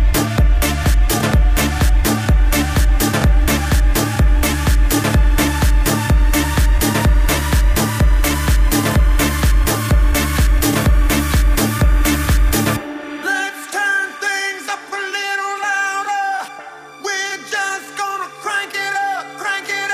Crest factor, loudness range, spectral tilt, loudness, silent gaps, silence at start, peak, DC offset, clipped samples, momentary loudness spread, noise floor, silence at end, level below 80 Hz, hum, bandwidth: 12 dB; 5 LU; -4.5 dB/octave; -17 LUFS; none; 0 s; -2 dBFS; under 0.1%; under 0.1%; 7 LU; -35 dBFS; 0 s; -16 dBFS; none; 15.5 kHz